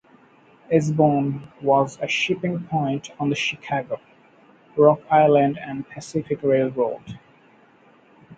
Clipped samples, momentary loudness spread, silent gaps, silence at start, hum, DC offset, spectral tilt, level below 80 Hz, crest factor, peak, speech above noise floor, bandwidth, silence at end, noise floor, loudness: under 0.1%; 15 LU; none; 0.7 s; none; under 0.1%; -6 dB/octave; -62 dBFS; 20 dB; -2 dBFS; 33 dB; 9 kHz; 0.05 s; -54 dBFS; -21 LUFS